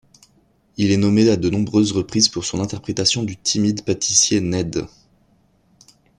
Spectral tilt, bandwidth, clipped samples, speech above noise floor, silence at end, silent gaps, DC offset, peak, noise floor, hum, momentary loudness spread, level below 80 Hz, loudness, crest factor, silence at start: -4 dB/octave; 11 kHz; under 0.1%; 40 dB; 1.3 s; none; under 0.1%; -2 dBFS; -59 dBFS; none; 10 LU; -50 dBFS; -18 LUFS; 18 dB; 0.8 s